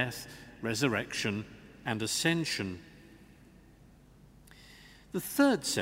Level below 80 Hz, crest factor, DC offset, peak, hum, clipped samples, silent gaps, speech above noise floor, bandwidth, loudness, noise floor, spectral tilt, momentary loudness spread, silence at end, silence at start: -62 dBFS; 22 dB; under 0.1%; -12 dBFS; none; under 0.1%; none; 26 dB; 16 kHz; -32 LUFS; -58 dBFS; -4 dB/octave; 21 LU; 0 s; 0 s